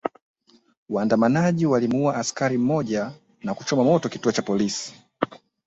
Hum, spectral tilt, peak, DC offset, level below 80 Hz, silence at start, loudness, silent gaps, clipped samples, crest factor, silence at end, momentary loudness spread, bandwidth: none; -5.5 dB/octave; -2 dBFS; under 0.1%; -62 dBFS; 0.05 s; -23 LUFS; 0.22-0.34 s, 0.77-0.86 s; under 0.1%; 20 dB; 0.3 s; 11 LU; 8.2 kHz